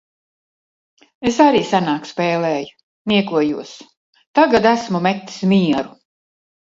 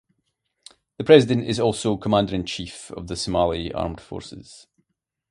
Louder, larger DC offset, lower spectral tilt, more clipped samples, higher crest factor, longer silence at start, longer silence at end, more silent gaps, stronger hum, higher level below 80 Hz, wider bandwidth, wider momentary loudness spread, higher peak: first, -17 LUFS vs -21 LUFS; neither; about the same, -6 dB/octave vs -5.5 dB/octave; neither; about the same, 18 dB vs 22 dB; first, 1.2 s vs 1 s; about the same, 0.85 s vs 0.75 s; first, 2.83-3.05 s, 3.97-4.13 s, 4.27-4.34 s vs none; neither; second, -56 dBFS vs -46 dBFS; second, 7.8 kHz vs 11.5 kHz; second, 13 LU vs 21 LU; about the same, 0 dBFS vs 0 dBFS